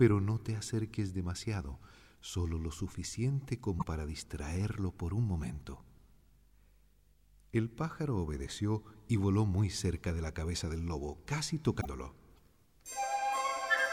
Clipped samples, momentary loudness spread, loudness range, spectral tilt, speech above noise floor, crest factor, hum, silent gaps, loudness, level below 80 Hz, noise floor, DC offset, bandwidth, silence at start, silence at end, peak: under 0.1%; 11 LU; 5 LU; -5.5 dB/octave; 32 dB; 20 dB; 50 Hz at -65 dBFS; none; -36 LUFS; -48 dBFS; -67 dBFS; under 0.1%; 16 kHz; 0 s; 0 s; -14 dBFS